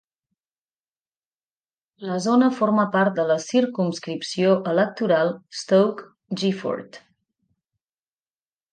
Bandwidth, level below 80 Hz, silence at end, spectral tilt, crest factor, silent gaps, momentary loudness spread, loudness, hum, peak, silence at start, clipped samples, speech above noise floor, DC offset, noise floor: 9.4 kHz; -74 dBFS; 1.75 s; -6 dB/octave; 18 dB; none; 10 LU; -22 LUFS; none; -6 dBFS; 2 s; under 0.1%; over 69 dB; under 0.1%; under -90 dBFS